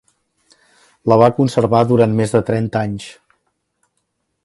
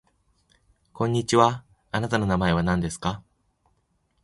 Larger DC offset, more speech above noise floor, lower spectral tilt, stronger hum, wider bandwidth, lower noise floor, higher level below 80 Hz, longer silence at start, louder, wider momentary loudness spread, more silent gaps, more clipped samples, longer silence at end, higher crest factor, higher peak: neither; first, 56 dB vs 47 dB; first, -7.5 dB/octave vs -5.5 dB/octave; neither; about the same, 11.5 kHz vs 11.5 kHz; about the same, -70 dBFS vs -70 dBFS; about the same, -50 dBFS vs -46 dBFS; about the same, 1.05 s vs 0.95 s; first, -15 LUFS vs -24 LUFS; about the same, 12 LU vs 11 LU; neither; neither; first, 1.35 s vs 1.05 s; second, 18 dB vs 24 dB; about the same, 0 dBFS vs -2 dBFS